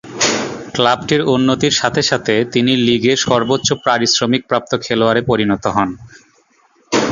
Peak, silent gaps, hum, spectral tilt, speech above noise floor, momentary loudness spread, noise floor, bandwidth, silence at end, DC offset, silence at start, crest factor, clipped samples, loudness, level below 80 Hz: 0 dBFS; none; none; -4 dB/octave; 40 dB; 5 LU; -55 dBFS; 7.6 kHz; 0 s; under 0.1%; 0.05 s; 16 dB; under 0.1%; -15 LUFS; -48 dBFS